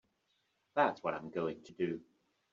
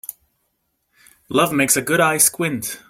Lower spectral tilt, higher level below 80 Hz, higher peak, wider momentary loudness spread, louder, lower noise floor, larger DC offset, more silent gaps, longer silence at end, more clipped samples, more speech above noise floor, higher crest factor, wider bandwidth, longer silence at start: first, -4.5 dB/octave vs -3 dB/octave; second, -78 dBFS vs -60 dBFS; second, -16 dBFS vs 0 dBFS; about the same, 8 LU vs 9 LU; second, -37 LUFS vs -17 LUFS; first, -79 dBFS vs -71 dBFS; neither; neither; first, 0.5 s vs 0.1 s; neither; second, 43 dB vs 53 dB; about the same, 24 dB vs 20 dB; second, 7.4 kHz vs 16.5 kHz; second, 0.75 s vs 1.3 s